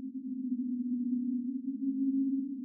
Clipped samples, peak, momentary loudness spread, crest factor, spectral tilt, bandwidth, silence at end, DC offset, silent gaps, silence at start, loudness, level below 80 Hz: under 0.1%; -24 dBFS; 6 LU; 10 dB; -6.5 dB/octave; 0.4 kHz; 0 s; under 0.1%; none; 0 s; -34 LUFS; under -90 dBFS